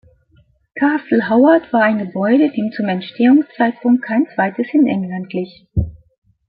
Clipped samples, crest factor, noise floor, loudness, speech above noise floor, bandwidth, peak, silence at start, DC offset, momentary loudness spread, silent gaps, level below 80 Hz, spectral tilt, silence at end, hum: under 0.1%; 14 dB; -55 dBFS; -16 LUFS; 40 dB; 4.9 kHz; -2 dBFS; 0.75 s; under 0.1%; 11 LU; none; -40 dBFS; -12 dB/octave; 0.5 s; none